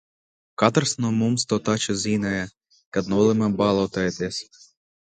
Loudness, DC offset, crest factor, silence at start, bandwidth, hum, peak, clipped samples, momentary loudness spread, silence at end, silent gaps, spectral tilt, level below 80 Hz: -23 LUFS; under 0.1%; 22 dB; 0.6 s; 9.6 kHz; none; -2 dBFS; under 0.1%; 9 LU; 0.65 s; 2.86-2.92 s; -5 dB/octave; -54 dBFS